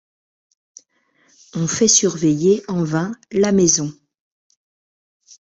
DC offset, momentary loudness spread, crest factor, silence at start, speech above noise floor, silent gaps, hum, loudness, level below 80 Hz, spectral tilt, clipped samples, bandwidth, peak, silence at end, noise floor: under 0.1%; 11 LU; 18 dB; 1.55 s; 44 dB; none; none; -17 LUFS; -56 dBFS; -4 dB/octave; under 0.1%; 8.2 kHz; -2 dBFS; 1.5 s; -61 dBFS